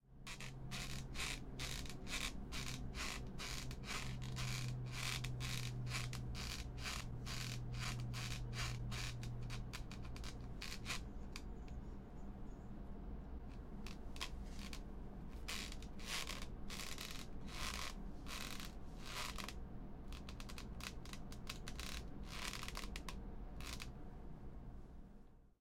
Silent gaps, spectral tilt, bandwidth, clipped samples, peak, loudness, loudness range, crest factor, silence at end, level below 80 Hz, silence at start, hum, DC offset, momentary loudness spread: none; -3.5 dB/octave; 16.5 kHz; under 0.1%; -26 dBFS; -48 LUFS; 6 LU; 20 dB; 0.1 s; -52 dBFS; 0.05 s; none; under 0.1%; 10 LU